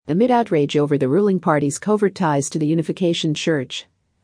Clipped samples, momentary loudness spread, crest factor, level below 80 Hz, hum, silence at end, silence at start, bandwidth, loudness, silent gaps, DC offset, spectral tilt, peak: under 0.1%; 4 LU; 16 dB; -64 dBFS; none; 0.4 s; 0.05 s; 10.5 kHz; -19 LUFS; none; under 0.1%; -5.5 dB/octave; -4 dBFS